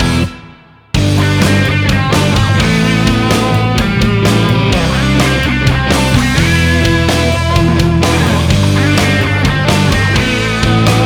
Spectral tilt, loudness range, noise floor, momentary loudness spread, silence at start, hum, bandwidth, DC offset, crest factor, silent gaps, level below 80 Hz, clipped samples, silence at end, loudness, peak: -5.5 dB/octave; 1 LU; -38 dBFS; 2 LU; 0 s; none; 18.5 kHz; under 0.1%; 10 dB; none; -22 dBFS; under 0.1%; 0 s; -11 LUFS; 0 dBFS